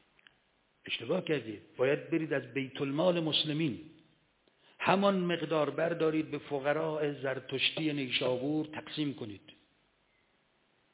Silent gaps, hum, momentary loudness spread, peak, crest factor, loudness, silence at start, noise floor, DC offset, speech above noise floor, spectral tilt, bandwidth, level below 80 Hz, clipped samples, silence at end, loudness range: none; none; 9 LU; -10 dBFS; 24 dB; -32 LUFS; 0.85 s; -72 dBFS; under 0.1%; 40 dB; -3.5 dB/octave; 4 kHz; -74 dBFS; under 0.1%; 1.45 s; 3 LU